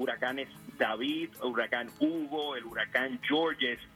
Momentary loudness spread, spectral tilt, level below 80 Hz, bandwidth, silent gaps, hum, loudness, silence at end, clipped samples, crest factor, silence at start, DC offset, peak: 5 LU; -4.5 dB/octave; -70 dBFS; 16 kHz; none; none; -32 LUFS; 0.1 s; under 0.1%; 20 dB; 0 s; under 0.1%; -14 dBFS